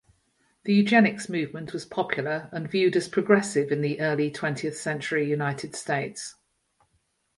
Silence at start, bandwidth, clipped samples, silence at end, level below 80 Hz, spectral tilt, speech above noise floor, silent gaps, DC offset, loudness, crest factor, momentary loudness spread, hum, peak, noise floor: 0.65 s; 11.5 kHz; under 0.1%; 1.05 s; -68 dBFS; -5.5 dB/octave; 46 dB; none; under 0.1%; -26 LUFS; 22 dB; 12 LU; none; -4 dBFS; -72 dBFS